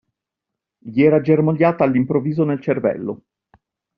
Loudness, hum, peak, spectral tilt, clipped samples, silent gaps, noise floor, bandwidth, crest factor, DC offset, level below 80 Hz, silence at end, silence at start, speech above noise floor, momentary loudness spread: -18 LUFS; none; -2 dBFS; -8.5 dB/octave; under 0.1%; none; -83 dBFS; 5.4 kHz; 16 dB; under 0.1%; -60 dBFS; 0.8 s; 0.85 s; 66 dB; 11 LU